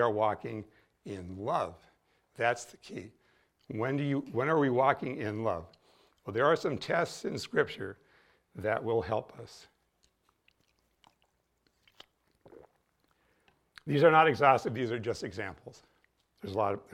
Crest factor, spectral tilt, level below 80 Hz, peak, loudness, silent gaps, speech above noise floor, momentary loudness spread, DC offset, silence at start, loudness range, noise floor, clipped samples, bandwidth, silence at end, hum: 24 dB; -6 dB/octave; -68 dBFS; -8 dBFS; -30 LUFS; none; 45 dB; 20 LU; under 0.1%; 0 s; 9 LU; -75 dBFS; under 0.1%; 14 kHz; 0.1 s; none